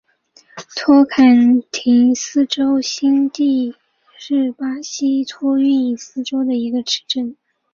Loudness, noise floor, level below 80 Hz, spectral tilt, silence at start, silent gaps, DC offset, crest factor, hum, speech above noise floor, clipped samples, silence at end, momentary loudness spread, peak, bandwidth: -16 LUFS; -52 dBFS; -62 dBFS; -3 dB/octave; 0.55 s; none; under 0.1%; 14 dB; none; 37 dB; under 0.1%; 0.4 s; 12 LU; -2 dBFS; 7.2 kHz